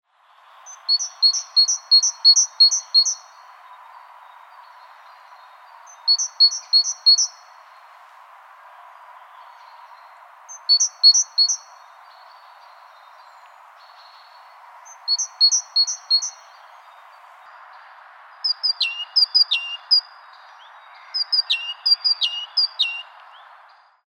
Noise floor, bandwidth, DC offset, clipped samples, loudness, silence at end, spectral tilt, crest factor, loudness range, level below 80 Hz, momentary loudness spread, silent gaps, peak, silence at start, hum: -53 dBFS; 15.5 kHz; under 0.1%; under 0.1%; -16 LUFS; 1.05 s; 12 dB/octave; 18 dB; 9 LU; under -90 dBFS; 11 LU; none; -4 dBFS; 0.65 s; none